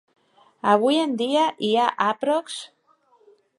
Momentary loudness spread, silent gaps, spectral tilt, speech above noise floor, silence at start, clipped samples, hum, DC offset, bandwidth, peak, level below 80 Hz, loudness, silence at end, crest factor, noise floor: 14 LU; none; -4 dB/octave; 39 dB; 0.65 s; under 0.1%; none; under 0.1%; 11.5 kHz; -4 dBFS; -80 dBFS; -22 LUFS; 0.95 s; 20 dB; -61 dBFS